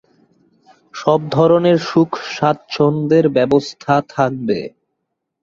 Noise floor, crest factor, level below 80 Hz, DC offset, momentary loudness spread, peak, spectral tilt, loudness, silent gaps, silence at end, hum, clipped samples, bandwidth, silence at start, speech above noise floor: -75 dBFS; 16 dB; -56 dBFS; under 0.1%; 8 LU; -2 dBFS; -7 dB/octave; -16 LUFS; none; 0.75 s; none; under 0.1%; 7.6 kHz; 0.95 s; 60 dB